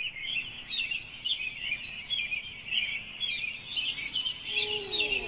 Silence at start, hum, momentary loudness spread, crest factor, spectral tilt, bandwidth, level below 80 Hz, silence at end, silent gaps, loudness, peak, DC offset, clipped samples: 0 s; none; 4 LU; 18 dB; 1.5 dB/octave; 4 kHz; -58 dBFS; 0 s; none; -31 LUFS; -16 dBFS; under 0.1%; under 0.1%